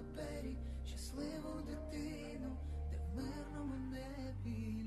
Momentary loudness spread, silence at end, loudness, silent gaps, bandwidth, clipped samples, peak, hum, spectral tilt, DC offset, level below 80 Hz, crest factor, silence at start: 3 LU; 0 s; -46 LUFS; none; 12.5 kHz; under 0.1%; -32 dBFS; none; -6.5 dB/octave; under 0.1%; -48 dBFS; 12 dB; 0 s